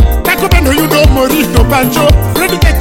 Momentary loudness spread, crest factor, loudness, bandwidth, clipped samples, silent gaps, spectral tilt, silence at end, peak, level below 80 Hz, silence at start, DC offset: 2 LU; 8 dB; -9 LUFS; 17 kHz; 0.5%; none; -5 dB/octave; 0 s; 0 dBFS; -12 dBFS; 0 s; under 0.1%